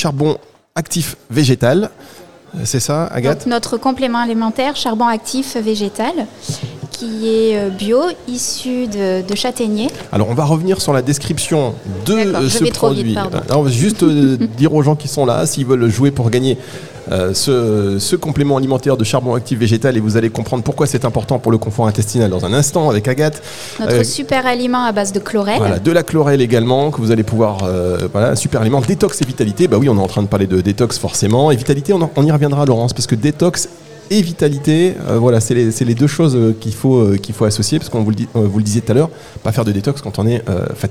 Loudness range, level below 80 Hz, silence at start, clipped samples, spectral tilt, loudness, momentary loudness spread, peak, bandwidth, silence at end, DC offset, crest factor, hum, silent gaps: 3 LU; -46 dBFS; 0 s; under 0.1%; -5.5 dB/octave; -15 LUFS; 7 LU; 0 dBFS; 16.5 kHz; 0 s; 1%; 14 dB; none; none